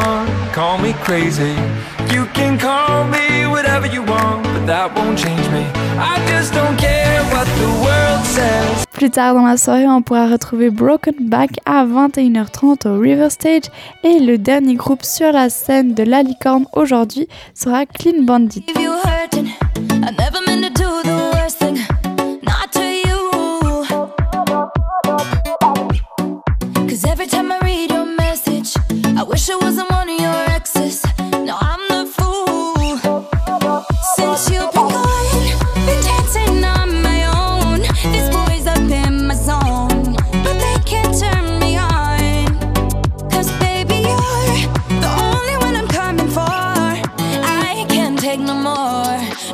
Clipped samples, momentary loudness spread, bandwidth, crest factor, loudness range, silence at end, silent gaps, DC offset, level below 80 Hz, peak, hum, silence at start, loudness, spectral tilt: under 0.1%; 6 LU; 16.5 kHz; 12 dB; 4 LU; 0 s; none; under 0.1%; -24 dBFS; -2 dBFS; none; 0 s; -15 LUFS; -5 dB/octave